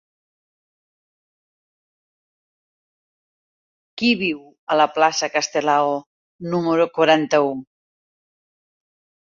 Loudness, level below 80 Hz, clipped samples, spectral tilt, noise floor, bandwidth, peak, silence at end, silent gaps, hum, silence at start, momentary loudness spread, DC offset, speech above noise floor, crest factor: -19 LUFS; -68 dBFS; under 0.1%; -4 dB/octave; under -90 dBFS; 7.6 kHz; -2 dBFS; 1.75 s; 4.59-4.67 s, 6.06-6.39 s; none; 3.95 s; 13 LU; under 0.1%; over 71 dB; 22 dB